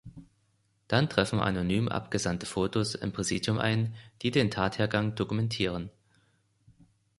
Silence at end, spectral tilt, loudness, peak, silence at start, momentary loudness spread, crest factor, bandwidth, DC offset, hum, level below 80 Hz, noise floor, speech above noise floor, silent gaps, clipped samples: 1.3 s; -5 dB/octave; -29 LUFS; -8 dBFS; 0.05 s; 5 LU; 22 dB; 11.5 kHz; under 0.1%; none; -54 dBFS; -71 dBFS; 42 dB; none; under 0.1%